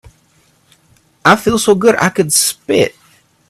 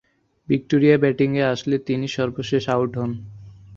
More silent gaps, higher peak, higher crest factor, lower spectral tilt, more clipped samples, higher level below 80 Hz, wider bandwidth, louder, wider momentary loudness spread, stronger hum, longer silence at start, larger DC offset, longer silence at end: neither; about the same, 0 dBFS vs -2 dBFS; about the same, 14 dB vs 18 dB; second, -3.5 dB/octave vs -7 dB/octave; neither; first, -48 dBFS vs -54 dBFS; first, 15.5 kHz vs 7.6 kHz; first, -12 LUFS vs -21 LUFS; second, 4 LU vs 11 LU; neither; first, 1.25 s vs 0.5 s; neither; first, 0.6 s vs 0 s